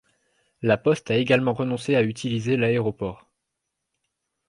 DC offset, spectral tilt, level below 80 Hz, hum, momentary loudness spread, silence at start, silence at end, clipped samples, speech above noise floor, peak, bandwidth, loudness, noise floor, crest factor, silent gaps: under 0.1%; -6.5 dB/octave; -58 dBFS; none; 8 LU; 0.6 s; 1.35 s; under 0.1%; 59 dB; -6 dBFS; 11 kHz; -23 LUFS; -81 dBFS; 18 dB; none